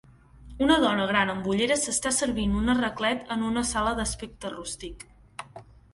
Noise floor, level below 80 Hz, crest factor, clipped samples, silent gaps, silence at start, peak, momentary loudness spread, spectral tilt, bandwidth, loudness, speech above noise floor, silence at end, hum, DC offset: -49 dBFS; -44 dBFS; 20 dB; under 0.1%; none; 0.4 s; -8 dBFS; 20 LU; -3.5 dB/octave; 11.5 kHz; -26 LUFS; 23 dB; 0.3 s; none; under 0.1%